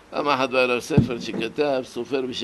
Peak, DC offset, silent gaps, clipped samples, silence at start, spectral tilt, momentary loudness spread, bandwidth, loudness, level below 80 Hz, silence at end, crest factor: -4 dBFS; under 0.1%; none; under 0.1%; 0.1 s; -6 dB/octave; 8 LU; 12 kHz; -23 LUFS; -46 dBFS; 0 s; 20 dB